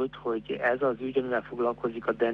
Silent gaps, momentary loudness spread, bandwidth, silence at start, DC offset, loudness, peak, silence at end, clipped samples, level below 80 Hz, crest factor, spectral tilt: none; 5 LU; 5.8 kHz; 0 s; under 0.1%; -29 LUFS; -14 dBFS; 0 s; under 0.1%; -60 dBFS; 16 dB; -8 dB/octave